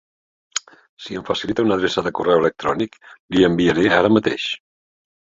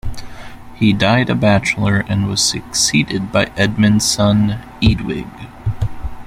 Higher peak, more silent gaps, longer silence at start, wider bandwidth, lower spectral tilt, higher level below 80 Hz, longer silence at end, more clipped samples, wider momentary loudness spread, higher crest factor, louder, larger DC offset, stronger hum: about the same, -2 dBFS vs -2 dBFS; first, 0.89-0.97 s, 3.20-3.28 s vs none; first, 0.55 s vs 0.05 s; second, 7.8 kHz vs 15.5 kHz; about the same, -5 dB/octave vs -4.5 dB/octave; second, -50 dBFS vs -32 dBFS; first, 0.65 s vs 0 s; neither; about the same, 13 LU vs 12 LU; about the same, 18 dB vs 14 dB; second, -19 LUFS vs -15 LUFS; neither; neither